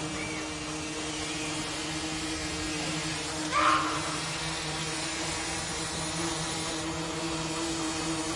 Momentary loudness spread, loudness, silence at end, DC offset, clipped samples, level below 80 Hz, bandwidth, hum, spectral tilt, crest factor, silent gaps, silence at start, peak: 6 LU; -31 LUFS; 0 s; under 0.1%; under 0.1%; -52 dBFS; 11.5 kHz; none; -2.5 dB/octave; 20 dB; none; 0 s; -12 dBFS